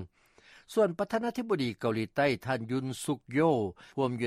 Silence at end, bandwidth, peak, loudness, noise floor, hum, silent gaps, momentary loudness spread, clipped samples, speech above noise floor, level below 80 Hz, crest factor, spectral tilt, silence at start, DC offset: 0 s; 15.5 kHz; -14 dBFS; -31 LUFS; -60 dBFS; none; none; 7 LU; under 0.1%; 30 dB; -66 dBFS; 16 dB; -6 dB/octave; 0 s; under 0.1%